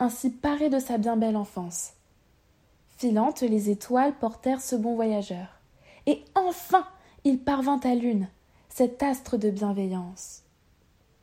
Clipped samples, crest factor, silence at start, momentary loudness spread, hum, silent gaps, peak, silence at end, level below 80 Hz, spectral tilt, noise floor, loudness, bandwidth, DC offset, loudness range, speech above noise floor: under 0.1%; 20 dB; 0 s; 12 LU; none; none; -6 dBFS; 0.85 s; -60 dBFS; -5.5 dB/octave; -63 dBFS; -27 LUFS; 16 kHz; under 0.1%; 2 LU; 37 dB